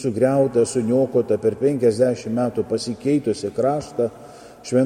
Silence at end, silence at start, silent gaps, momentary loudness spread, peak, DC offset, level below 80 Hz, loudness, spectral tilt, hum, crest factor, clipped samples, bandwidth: 0 s; 0 s; none; 7 LU; -6 dBFS; under 0.1%; -58 dBFS; -21 LUFS; -6.5 dB/octave; none; 14 dB; under 0.1%; 13 kHz